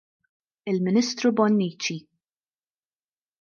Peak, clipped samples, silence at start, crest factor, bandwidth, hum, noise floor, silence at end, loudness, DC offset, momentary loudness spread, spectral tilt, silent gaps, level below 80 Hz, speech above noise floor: -8 dBFS; under 0.1%; 0.65 s; 18 dB; 7.2 kHz; none; under -90 dBFS; 1.4 s; -24 LUFS; under 0.1%; 12 LU; -5.5 dB/octave; none; -74 dBFS; over 67 dB